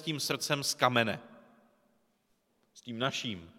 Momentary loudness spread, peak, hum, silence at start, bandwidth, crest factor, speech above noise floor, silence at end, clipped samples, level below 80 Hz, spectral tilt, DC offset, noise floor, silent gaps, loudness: 15 LU; -10 dBFS; none; 0 s; 16.5 kHz; 26 dB; 42 dB; 0.05 s; under 0.1%; -74 dBFS; -3 dB/octave; under 0.1%; -75 dBFS; none; -31 LUFS